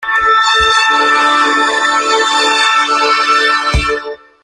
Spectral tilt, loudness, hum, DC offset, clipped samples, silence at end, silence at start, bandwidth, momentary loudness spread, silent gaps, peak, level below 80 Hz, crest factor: -2 dB/octave; -10 LUFS; none; under 0.1%; under 0.1%; 0.3 s; 0 s; 15 kHz; 5 LU; none; 0 dBFS; -30 dBFS; 12 dB